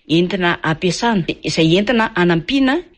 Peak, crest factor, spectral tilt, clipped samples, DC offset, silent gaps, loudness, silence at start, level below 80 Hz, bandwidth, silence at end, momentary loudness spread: -4 dBFS; 12 dB; -5.5 dB/octave; under 0.1%; under 0.1%; none; -16 LUFS; 0.1 s; -44 dBFS; 10 kHz; 0.15 s; 4 LU